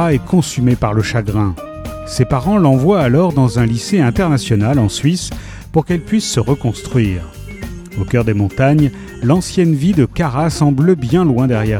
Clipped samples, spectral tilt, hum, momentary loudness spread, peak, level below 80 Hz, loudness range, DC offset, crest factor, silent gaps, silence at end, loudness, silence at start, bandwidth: under 0.1%; -6.5 dB/octave; none; 12 LU; 0 dBFS; -32 dBFS; 4 LU; under 0.1%; 14 dB; none; 0 s; -14 LUFS; 0 s; 15.5 kHz